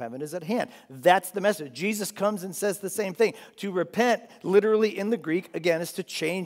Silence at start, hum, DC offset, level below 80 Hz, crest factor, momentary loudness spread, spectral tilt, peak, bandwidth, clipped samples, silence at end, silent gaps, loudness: 0 s; none; under 0.1%; -84 dBFS; 22 dB; 9 LU; -4.5 dB/octave; -4 dBFS; 16 kHz; under 0.1%; 0 s; none; -26 LUFS